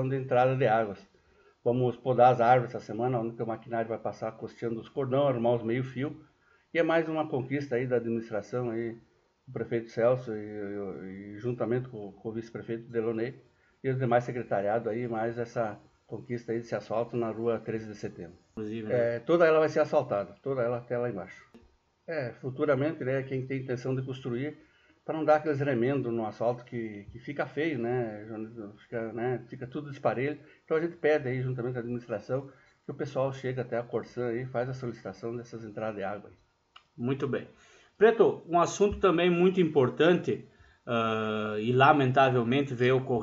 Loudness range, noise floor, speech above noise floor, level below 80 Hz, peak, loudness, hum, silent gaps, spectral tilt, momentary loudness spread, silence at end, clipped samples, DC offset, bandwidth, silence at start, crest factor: 9 LU; -63 dBFS; 34 dB; -64 dBFS; -8 dBFS; -30 LUFS; none; none; -5.5 dB/octave; 15 LU; 0 s; under 0.1%; under 0.1%; 7.8 kHz; 0 s; 22 dB